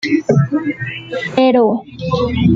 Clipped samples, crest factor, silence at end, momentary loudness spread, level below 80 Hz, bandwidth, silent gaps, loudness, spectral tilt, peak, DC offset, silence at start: under 0.1%; 14 dB; 0 s; 11 LU; -40 dBFS; 7.6 kHz; none; -16 LUFS; -7.5 dB/octave; -2 dBFS; under 0.1%; 0 s